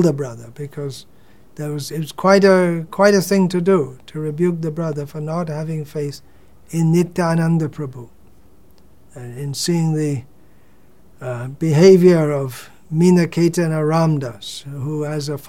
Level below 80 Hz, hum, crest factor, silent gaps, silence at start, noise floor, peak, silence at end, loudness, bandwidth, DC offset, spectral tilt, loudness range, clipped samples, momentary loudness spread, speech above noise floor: -56 dBFS; none; 18 dB; none; 0 s; -52 dBFS; -2 dBFS; 0 s; -18 LUFS; 16.5 kHz; 0.6%; -6.5 dB/octave; 9 LU; under 0.1%; 17 LU; 35 dB